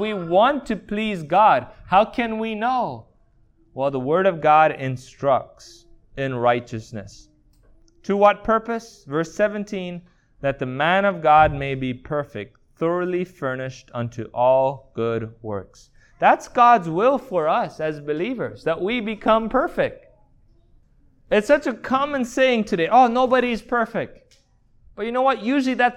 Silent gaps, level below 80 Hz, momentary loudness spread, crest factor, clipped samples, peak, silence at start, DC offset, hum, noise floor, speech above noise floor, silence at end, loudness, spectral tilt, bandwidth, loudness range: none; -50 dBFS; 14 LU; 18 dB; under 0.1%; -2 dBFS; 0 s; under 0.1%; none; -57 dBFS; 36 dB; 0 s; -21 LUFS; -6 dB/octave; 12 kHz; 4 LU